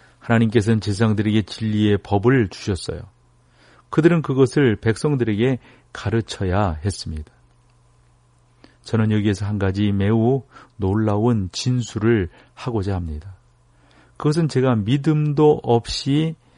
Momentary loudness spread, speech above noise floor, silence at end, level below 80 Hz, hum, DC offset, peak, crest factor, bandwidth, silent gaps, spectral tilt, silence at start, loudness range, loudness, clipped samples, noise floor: 10 LU; 37 dB; 0.25 s; -44 dBFS; none; under 0.1%; -2 dBFS; 18 dB; 10.5 kHz; none; -7 dB/octave; 0.25 s; 5 LU; -20 LUFS; under 0.1%; -56 dBFS